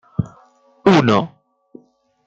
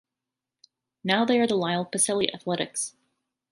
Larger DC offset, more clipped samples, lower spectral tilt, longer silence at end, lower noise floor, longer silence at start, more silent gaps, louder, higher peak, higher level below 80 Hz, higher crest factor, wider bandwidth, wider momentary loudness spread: neither; neither; first, -7 dB/octave vs -3 dB/octave; first, 1 s vs 0.65 s; second, -55 dBFS vs -88 dBFS; second, 0.2 s vs 1.05 s; neither; first, -16 LUFS vs -25 LUFS; first, -2 dBFS vs -6 dBFS; first, -52 dBFS vs -70 dBFS; about the same, 18 dB vs 22 dB; second, 8 kHz vs 11.5 kHz; first, 18 LU vs 9 LU